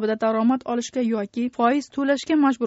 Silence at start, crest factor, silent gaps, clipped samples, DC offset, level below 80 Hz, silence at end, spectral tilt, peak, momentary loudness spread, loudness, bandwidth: 0 s; 14 dB; none; under 0.1%; under 0.1%; -66 dBFS; 0 s; -4 dB/octave; -6 dBFS; 5 LU; -22 LUFS; 8 kHz